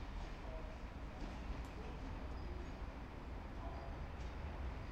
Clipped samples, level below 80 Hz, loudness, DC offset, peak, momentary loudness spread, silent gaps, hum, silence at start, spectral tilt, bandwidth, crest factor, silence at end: under 0.1%; -48 dBFS; -50 LUFS; under 0.1%; -34 dBFS; 3 LU; none; none; 0 s; -6.5 dB/octave; 9 kHz; 12 dB; 0 s